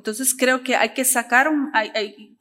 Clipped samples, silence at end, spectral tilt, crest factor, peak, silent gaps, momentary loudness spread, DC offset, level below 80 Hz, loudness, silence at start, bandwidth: under 0.1%; 0.15 s; -0.5 dB/octave; 20 dB; -2 dBFS; none; 9 LU; under 0.1%; -74 dBFS; -19 LUFS; 0.05 s; 16 kHz